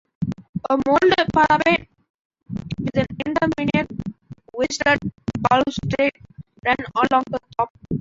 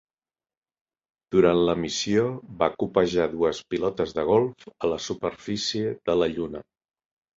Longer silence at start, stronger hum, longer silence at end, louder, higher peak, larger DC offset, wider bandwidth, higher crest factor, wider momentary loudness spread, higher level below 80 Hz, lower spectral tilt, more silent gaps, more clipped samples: second, 0.2 s vs 1.3 s; neither; second, 0 s vs 0.75 s; first, -21 LUFS vs -25 LUFS; about the same, -4 dBFS vs -6 dBFS; neither; about the same, 8 kHz vs 7.8 kHz; about the same, 18 dB vs 20 dB; first, 13 LU vs 9 LU; first, -46 dBFS vs -54 dBFS; about the same, -5.5 dB/octave vs -5 dB/octave; first, 0.49-0.53 s, 2.10-2.30 s, 7.70-7.75 s vs none; neither